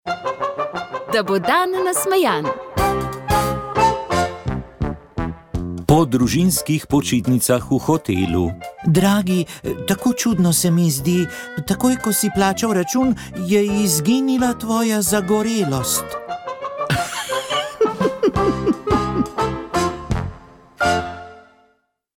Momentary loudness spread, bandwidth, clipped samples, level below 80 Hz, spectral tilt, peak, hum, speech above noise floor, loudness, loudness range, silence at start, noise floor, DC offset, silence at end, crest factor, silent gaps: 10 LU; 18 kHz; under 0.1%; -38 dBFS; -5 dB/octave; -4 dBFS; none; 46 dB; -19 LUFS; 3 LU; 0.05 s; -64 dBFS; under 0.1%; 0.75 s; 16 dB; none